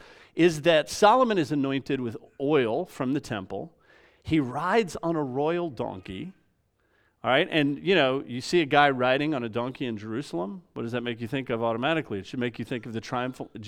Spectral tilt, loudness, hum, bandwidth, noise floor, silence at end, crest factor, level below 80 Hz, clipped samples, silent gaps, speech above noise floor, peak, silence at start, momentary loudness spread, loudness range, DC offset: -5.5 dB/octave; -26 LUFS; none; 15.5 kHz; -69 dBFS; 0 s; 22 dB; -62 dBFS; under 0.1%; none; 43 dB; -4 dBFS; 0.35 s; 14 LU; 6 LU; under 0.1%